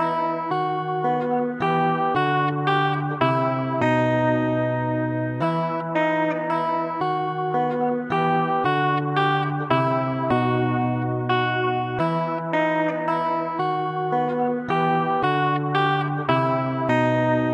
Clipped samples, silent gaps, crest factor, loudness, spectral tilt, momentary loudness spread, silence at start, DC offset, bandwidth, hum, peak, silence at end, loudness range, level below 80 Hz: under 0.1%; none; 18 dB; -22 LUFS; -8 dB/octave; 4 LU; 0 s; under 0.1%; 9.4 kHz; none; -4 dBFS; 0 s; 2 LU; -60 dBFS